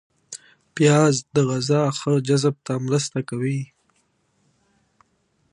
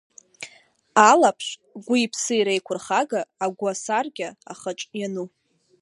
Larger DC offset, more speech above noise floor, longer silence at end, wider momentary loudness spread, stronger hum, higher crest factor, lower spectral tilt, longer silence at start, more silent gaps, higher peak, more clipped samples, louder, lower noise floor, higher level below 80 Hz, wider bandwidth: neither; first, 47 dB vs 33 dB; first, 1.9 s vs 0.55 s; about the same, 21 LU vs 22 LU; neither; about the same, 20 dB vs 22 dB; first, -5.5 dB/octave vs -3 dB/octave; about the same, 0.3 s vs 0.4 s; neither; second, -4 dBFS vs 0 dBFS; neither; about the same, -21 LUFS vs -22 LUFS; first, -67 dBFS vs -55 dBFS; first, -66 dBFS vs -78 dBFS; about the same, 11 kHz vs 11.5 kHz